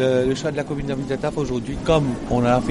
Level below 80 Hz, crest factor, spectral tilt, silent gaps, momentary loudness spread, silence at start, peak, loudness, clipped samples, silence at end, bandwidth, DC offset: -38 dBFS; 16 dB; -6.5 dB/octave; none; 7 LU; 0 s; -4 dBFS; -22 LUFS; under 0.1%; 0 s; 11.5 kHz; under 0.1%